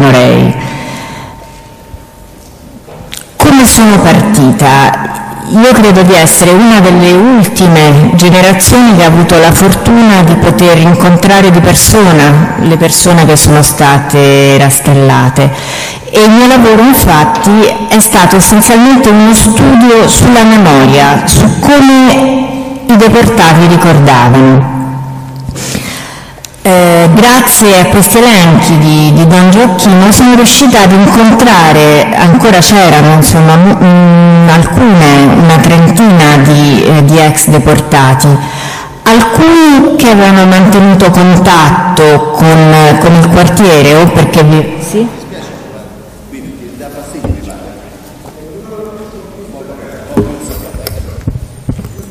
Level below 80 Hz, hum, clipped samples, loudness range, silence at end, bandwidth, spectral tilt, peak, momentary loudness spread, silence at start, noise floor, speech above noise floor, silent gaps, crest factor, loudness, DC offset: -26 dBFS; none; 3%; 12 LU; 0.05 s; over 20 kHz; -5 dB/octave; 0 dBFS; 16 LU; 0 s; -31 dBFS; 28 dB; none; 4 dB; -4 LUFS; under 0.1%